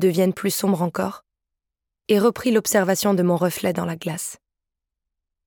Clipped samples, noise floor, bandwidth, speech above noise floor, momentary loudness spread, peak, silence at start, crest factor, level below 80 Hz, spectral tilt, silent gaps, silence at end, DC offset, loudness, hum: under 0.1%; -84 dBFS; 19 kHz; 64 dB; 10 LU; -6 dBFS; 0 s; 16 dB; -62 dBFS; -5 dB/octave; none; 1.1 s; under 0.1%; -21 LUFS; none